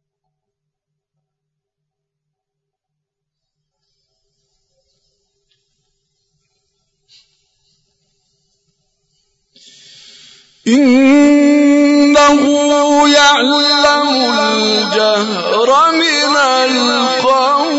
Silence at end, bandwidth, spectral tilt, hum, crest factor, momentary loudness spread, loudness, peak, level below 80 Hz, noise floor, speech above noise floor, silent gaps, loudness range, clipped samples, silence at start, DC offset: 0 s; 8 kHz; -2.5 dB/octave; none; 14 dB; 4 LU; -10 LUFS; -2 dBFS; -54 dBFS; -79 dBFS; 69 dB; none; 6 LU; under 0.1%; 10.65 s; under 0.1%